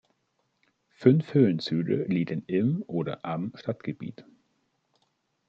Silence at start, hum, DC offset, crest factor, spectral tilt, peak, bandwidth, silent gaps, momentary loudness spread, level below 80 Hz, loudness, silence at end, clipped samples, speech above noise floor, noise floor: 1 s; none; under 0.1%; 22 dB; -9 dB/octave; -6 dBFS; 7.4 kHz; none; 12 LU; -70 dBFS; -27 LUFS; 1.25 s; under 0.1%; 49 dB; -75 dBFS